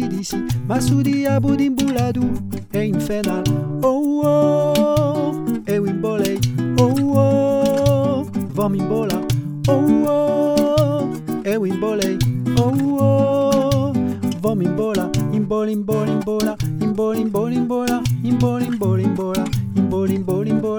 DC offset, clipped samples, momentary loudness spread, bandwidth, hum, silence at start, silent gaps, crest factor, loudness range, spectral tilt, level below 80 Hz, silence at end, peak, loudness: under 0.1%; under 0.1%; 6 LU; over 20 kHz; none; 0 s; none; 16 dB; 2 LU; -7 dB/octave; -42 dBFS; 0 s; -2 dBFS; -19 LUFS